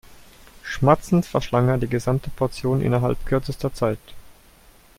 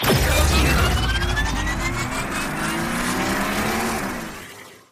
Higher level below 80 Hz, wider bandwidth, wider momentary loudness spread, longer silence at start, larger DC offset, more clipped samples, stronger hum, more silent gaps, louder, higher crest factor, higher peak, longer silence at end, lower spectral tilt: second, -40 dBFS vs -28 dBFS; about the same, 16 kHz vs 15.5 kHz; second, 9 LU vs 12 LU; about the same, 0.1 s vs 0 s; neither; neither; neither; neither; about the same, -22 LUFS vs -21 LUFS; about the same, 20 dB vs 16 dB; first, -2 dBFS vs -6 dBFS; first, 0.65 s vs 0.15 s; first, -7.5 dB/octave vs -4 dB/octave